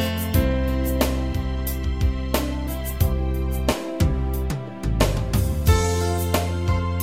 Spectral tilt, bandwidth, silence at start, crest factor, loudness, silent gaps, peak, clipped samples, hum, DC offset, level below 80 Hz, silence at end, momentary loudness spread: -6 dB/octave; 16.5 kHz; 0 s; 18 dB; -23 LUFS; none; -4 dBFS; under 0.1%; none; 0.5%; -26 dBFS; 0 s; 6 LU